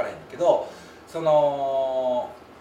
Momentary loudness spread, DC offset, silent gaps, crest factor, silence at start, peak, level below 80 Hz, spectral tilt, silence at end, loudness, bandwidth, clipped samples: 17 LU; under 0.1%; none; 18 dB; 0 s; -6 dBFS; -64 dBFS; -6 dB/octave; 0.05 s; -24 LUFS; 11.5 kHz; under 0.1%